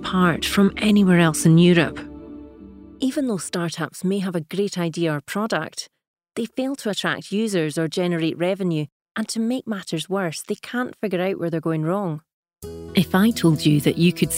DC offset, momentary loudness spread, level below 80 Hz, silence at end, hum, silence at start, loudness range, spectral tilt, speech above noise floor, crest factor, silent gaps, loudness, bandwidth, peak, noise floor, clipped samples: under 0.1%; 14 LU; -52 dBFS; 0 s; none; 0 s; 6 LU; -5.5 dB/octave; 22 dB; 18 dB; 6.07-6.14 s, 8.92-9.00 s, 9.11-9.15 s, 12.33-12.43 s; -21 LUFS; 16 kHz; -4 dBFS; -42 dBFS; under 0.1%